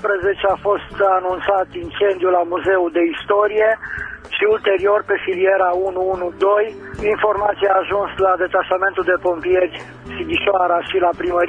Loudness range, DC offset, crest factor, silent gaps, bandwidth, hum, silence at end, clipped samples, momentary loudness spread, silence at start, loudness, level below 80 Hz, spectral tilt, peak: 1 LU; under 0.1%; 16 dB; none; 7.4 kHz; none; 0 s; under 0.1%; 6 LU; 0 s; -18 LUFS; -46 dBFS; -6.5 dB/octave; -2 dBFS